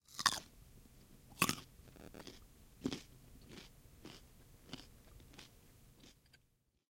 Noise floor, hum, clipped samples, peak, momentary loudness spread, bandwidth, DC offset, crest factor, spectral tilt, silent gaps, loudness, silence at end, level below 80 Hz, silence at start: -77 dBFS; none; under 0.1%; -12 dBFS; 27 LU; 16.5 kHz; under 0.1%; 36 dB; -2 dB/octave; none; -41 LUFS; 0.8 s; -66 dBFS; 0.1 s